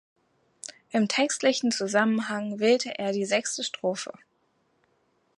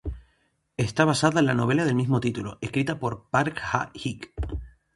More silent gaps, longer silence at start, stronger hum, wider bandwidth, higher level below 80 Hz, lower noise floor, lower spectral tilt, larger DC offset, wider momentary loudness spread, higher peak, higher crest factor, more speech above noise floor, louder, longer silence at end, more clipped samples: neither; first, 0.65 s vs 0.05 s; neither; about the same, 11.5 kHz vs 11.5 kHz; second, -78 dBFS vs -42 dBFS; about the same, -70 dBFS vs -69 dBFS; second, -3.5 dB/octave vs -6 dB/octave; neither; about the same, 13 LU vs 14 LU; second, -8 dBFS vs -4 dBFS; about the same, 20 dB vs 20 dB; about the same, 44 dB vs 45 dB; about the same, -26 LUFS vs -25 LUFS; first, 1.3 s vs 0.3 s; neither